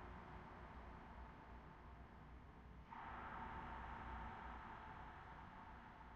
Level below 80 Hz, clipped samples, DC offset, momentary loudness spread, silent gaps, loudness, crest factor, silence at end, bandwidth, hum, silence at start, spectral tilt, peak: -62 dBFS; under 0.1%; under 0.1%; 9 LU; none; -56 LUFS; 16 dB; 0 s; 7.4 kHz; none; 0 s; -4.5 dB/octave; -40 dBFS